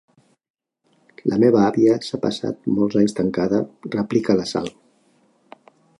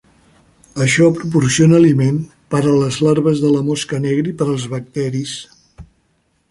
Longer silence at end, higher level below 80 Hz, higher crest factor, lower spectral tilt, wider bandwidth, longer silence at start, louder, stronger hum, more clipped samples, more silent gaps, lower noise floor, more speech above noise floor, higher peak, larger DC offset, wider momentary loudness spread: first, 1.3 s vs 0.65 s; second, -58 dBFS vs -50 dBFS; about the same, 18 dB vs 14 dB; about the same, -6.5 dB/octave vs -6 dB/octave; about the same, 11 kHz vs 11.5 kHz; first, 1.25 s vs 0.75 s; second, -20 LUFS vs -15 LUFS; neither; neither; neither; about the same, -64 dBFS vs -62 dBFS; about the same, 45 dB vs 48 dB; about the same, -4 dBFS vs -2 dBFS; neither; about the same, 11 LU vs 12 LU